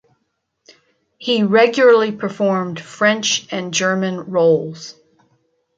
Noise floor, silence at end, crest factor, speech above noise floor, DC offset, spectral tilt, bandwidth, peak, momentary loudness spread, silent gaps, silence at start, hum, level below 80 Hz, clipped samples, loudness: -71 dBFS; 0.85 s; 16 dB; 55 dB; under 0.1%; -4 dB/octave; 7.8 kHz; -2 dBFS; 15 LU; none; 1.2 s; none; -66 dBFS; under 0.1%; -16 LUFS